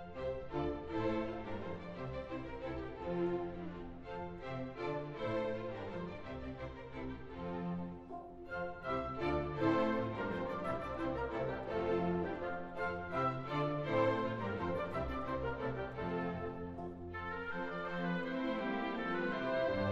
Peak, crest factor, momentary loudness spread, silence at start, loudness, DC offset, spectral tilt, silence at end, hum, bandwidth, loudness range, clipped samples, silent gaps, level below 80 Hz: -20 dBFS; 20 dB; 10 LU; 0 s; -40 LUFS; under 0.1%; -8 dB/octave; 0 s; none; 7.8 kHz; 6 LU; under 0.1%; none; -56 dBFS